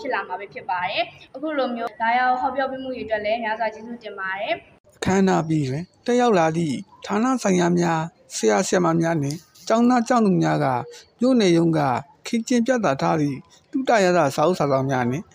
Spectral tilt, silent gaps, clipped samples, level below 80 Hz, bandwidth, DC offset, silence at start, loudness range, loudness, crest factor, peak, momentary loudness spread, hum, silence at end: -5.5 dB/octave; 4.80-4.84 s; under 0.1%; -58 dBFS; 16 kHz; under 0.1%; 0 s; 4 LU; -22 LUFS; 16 dB; -6 dBFS; 11 LU; none; 0.1 s